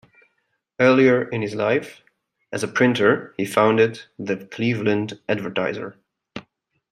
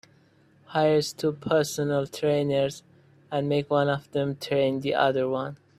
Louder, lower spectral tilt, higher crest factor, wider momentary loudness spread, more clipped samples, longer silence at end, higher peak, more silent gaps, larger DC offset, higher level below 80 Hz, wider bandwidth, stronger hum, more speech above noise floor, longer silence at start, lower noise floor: first, -20 LUFS vs -26 LUFS; about the same, -6 dB/octave vs -5.5 dB/octave; about the same, 20 dB vs 18 dB; first, 19 LU vs 7 LU; neither; first, 0.5 s vs 0.25 s; first, -2 dBFS vs -8 dBFS; neither; neither; about the same, -66 dBFS vs -64 dBFS; about the same, 15 kHz vs 15 kHz; neither; first, 52 dB vs 34 dB; about the same, 0.8 s vs 0.7 s; first, -72 dBFS vs -59 dBFS